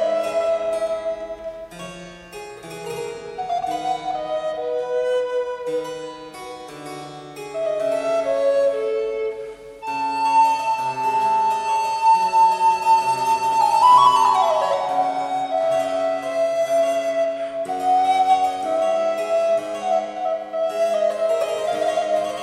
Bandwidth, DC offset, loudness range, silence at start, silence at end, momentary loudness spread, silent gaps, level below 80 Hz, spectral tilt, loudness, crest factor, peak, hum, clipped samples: 14 kHz; under 0.1%; 10 LU; 0 s; 0 s; 18 LU; none; -60 dBFS; -3 dB/octave; -20 LUFS; 16 dB; -4 dBFS; none; under 0.1%